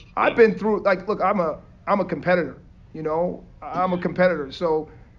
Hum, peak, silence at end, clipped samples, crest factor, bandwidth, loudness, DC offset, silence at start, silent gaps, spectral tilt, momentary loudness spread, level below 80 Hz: none; -4 dBFS; 0.2 s; under 0.1%; 18 dB; 7 kHz; -22 LUFS; under 0.1%; 0 s; none; -8 dB/octave; 14 LU; -50 dBFS